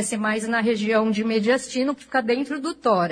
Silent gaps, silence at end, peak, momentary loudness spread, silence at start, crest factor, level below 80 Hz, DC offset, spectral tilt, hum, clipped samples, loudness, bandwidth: none; 0 s; -8 dBFS; 4 LU; 0 s; 14 dB; -64 dBFS; under 0.1%; -4.5 dB/octave; none; under 0.1%; -23 LUFS; 10.5 kHz